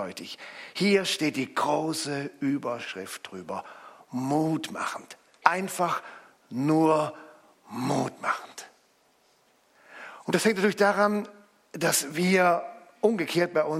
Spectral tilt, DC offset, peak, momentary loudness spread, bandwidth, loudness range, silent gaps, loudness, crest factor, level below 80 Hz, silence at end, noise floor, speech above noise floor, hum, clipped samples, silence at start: -4.5 dB/octave; under 0.1%; -2 dBFS; 18 LU; 16.5 kHz; 6 LU; none; -27 LUFS; 26 dB; -76 dBFS; 0 s; -65 dBFS; 38 dB; none; under 0.1%; 0 s